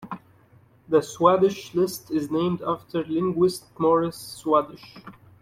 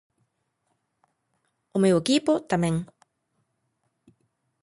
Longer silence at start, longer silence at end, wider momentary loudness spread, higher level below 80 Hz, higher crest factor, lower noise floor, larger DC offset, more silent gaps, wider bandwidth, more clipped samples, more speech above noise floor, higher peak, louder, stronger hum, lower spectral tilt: second, 0 s vs 1.75 s; second, 0.3 s vs 1.8 s; first, 16 LU vs 10 LU; about the same, -62 dBFS vs -62 dBFS; about the same, 20 dB vs 18 dB; second, -56 dBFS vs -75 dBFS; neither; neither; first, 16 kHz vs 11.5 kHz; neither; second, 33 dB vs 53 dB; first, -4 dBFS vs -10 dBFS; about the same, -24 LUFS vs -24 LUFS; neither; about the same, -6 dB/octave vs -5.5 dB/octave